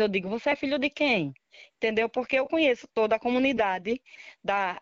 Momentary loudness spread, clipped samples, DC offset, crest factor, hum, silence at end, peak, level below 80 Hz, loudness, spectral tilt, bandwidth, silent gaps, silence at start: 7 LU; under 0.1%; under 0.1%; 16 dB; none; 0 s; -10 dBFS; -62 dBFS; -27 LUFS; -2.5 dB/octave; 7.6 kHz; none; 0 s